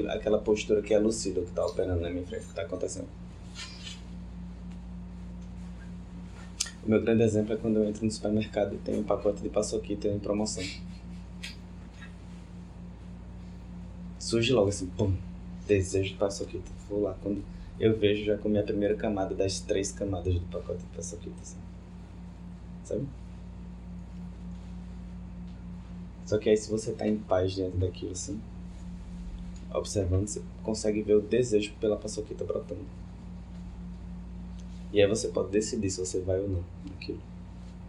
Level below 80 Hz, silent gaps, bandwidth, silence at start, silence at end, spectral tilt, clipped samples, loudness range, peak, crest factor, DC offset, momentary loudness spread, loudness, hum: -46 dBFS; none; 12 kHz; 0 s; 0 s; -5.5 dB/octave; under 0.1%; 12 LU; -10 dBFS; 22 dB; under 0.1%; 18 LU; -30 LUFS; none